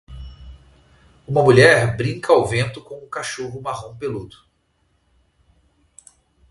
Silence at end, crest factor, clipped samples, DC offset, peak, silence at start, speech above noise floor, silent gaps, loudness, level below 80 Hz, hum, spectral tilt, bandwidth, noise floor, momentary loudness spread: 2.25 s; 22 dB; under 0.1%; under 0.1%; 0 dBFS; 0.1 s; 47 dB; none; -18 LUFS; -46 dBFS; none; -5.5 dB/octave; 11.5 kHz; -65 dBFS; 23 LU